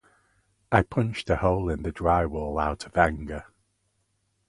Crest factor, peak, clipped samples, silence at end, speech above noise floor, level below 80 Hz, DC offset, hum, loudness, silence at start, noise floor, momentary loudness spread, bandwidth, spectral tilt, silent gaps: 24 dB; -4 dBFS; under 0.1%; 1.05 s; 48 dB; -40 dBFS; under 0.1%; none; -26 LUFS; 0.7 s; -73 dBFS; 7 LU; 11.5 kHz; -7 dB/octave; none